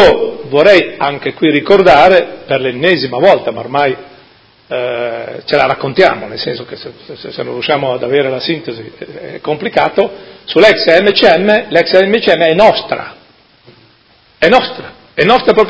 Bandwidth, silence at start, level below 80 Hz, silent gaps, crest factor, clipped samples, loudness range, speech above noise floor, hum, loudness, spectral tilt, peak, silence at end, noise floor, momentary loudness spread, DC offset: 8 kHz; 0 s; -44 dBFS; none; 12 dB; 1%; 7 LU; 37 dB; none; -11 LUFS; -5.5 dB/octave; 0 dBFS; 0 s; -48 dBFS; 17 LU; under 0.1%